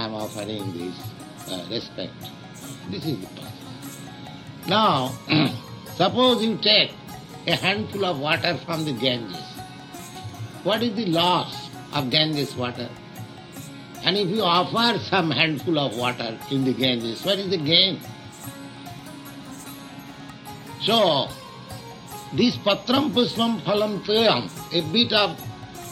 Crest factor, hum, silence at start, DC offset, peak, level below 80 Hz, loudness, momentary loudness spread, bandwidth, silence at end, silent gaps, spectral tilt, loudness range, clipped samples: 22 dB; none; 0 s; under 0.1%; -4 dBFS; -60 dBFS; -22 LUFS; 20 LU; 16.5 kHz; 0 s; none; -4.5 dB/octave; 7 LU; under 0.1%